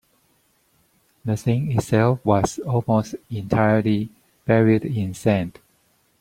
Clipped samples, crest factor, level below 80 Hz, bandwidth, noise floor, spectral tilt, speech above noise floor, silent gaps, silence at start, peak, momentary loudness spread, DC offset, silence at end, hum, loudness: under 0.1%; 18 dB; -50 dBFS; 15 kHz; -63 dBFS; -7.5 dB/octave; 43 dB; none; 1.25 s; -2 dBFS; 13 LU; under 0.1%; 0.7 s; none; -21 LUFS